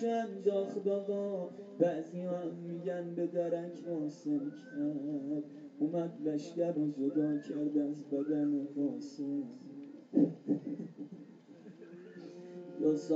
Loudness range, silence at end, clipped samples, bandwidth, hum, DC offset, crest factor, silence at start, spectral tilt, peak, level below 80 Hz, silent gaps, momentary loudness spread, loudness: 3 LU; 0 s; under 0.1%; 7.8 kHz; none; under 0.1%; 20 dB; 0 s; -8 dB/octave; -16 dBFS; under -90 dBFS; none; 16 LU; -36 LUFS